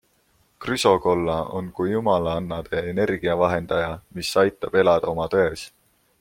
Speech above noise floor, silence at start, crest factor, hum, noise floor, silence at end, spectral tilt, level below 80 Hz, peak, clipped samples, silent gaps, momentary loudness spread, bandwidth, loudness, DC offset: 41 dB; 0.6 s; 20 dB; none; -63 dBFS; 0.55 s; -5.5 dB/octave; -50 dBFS; -2 dBFS; under 0.1%; none; 10 LU; 16.5 kHz; -22 LUFS; under 0.1%